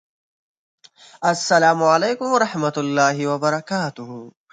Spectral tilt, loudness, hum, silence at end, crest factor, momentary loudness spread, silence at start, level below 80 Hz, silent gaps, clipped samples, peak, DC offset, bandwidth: -4.5 dB/octave; -19 LUFS; none; 0.2 s; 18 dB; 12 LU; 1.2 s; -70 dBFS; none; under 0.1%; -2 dBFS; under 0.1%; 9.4 kHz